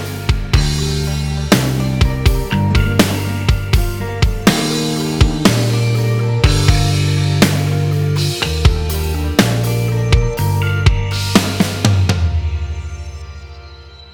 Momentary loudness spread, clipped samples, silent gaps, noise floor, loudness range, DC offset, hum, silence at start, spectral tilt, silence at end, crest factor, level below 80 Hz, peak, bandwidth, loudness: 7 LU; under 0.1%; none; -36 dBFS; 2 LU; under 0.1%; none; 0 s; -5.5 dB/octave; 0 s; 14 dB; -22 dBFS; 0 dBFS; 19.5 kHz; -15 LUFS